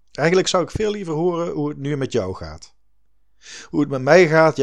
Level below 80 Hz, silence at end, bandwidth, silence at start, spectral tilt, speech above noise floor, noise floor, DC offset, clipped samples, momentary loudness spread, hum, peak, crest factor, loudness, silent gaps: -48 dBFS; 0 s; 10.5 kHz; 0.2 s; -5.5 dB/octave; 48 dB; -66 dBFS; 0.5%; under 0.1%; 18 LU; none; 0 dBFS; 20 dB; -19 LUFS; none